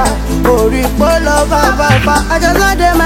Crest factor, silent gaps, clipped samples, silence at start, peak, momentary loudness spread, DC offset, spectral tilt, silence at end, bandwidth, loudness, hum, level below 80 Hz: 10 dB; none; 0.4%; 0 s; 0 dBFS; 3 LU; under 0.1%; -4.5 dB/octave; 0 s; 17 kHz; -10 LUFS; none; -18 dBFS